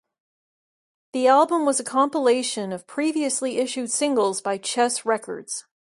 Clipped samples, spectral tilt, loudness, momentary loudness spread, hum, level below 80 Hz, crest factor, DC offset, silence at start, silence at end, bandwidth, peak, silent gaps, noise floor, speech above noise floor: under 0.1%; -2.5 dB/octave; -22 LUFS; 12 LU; none; -74 dBFS; 18 dB; under 0.1%; 1.15 s; 0.35 s; 11.5 kHz; -6 dBFS; none; under -90 dBFS; over 68 dB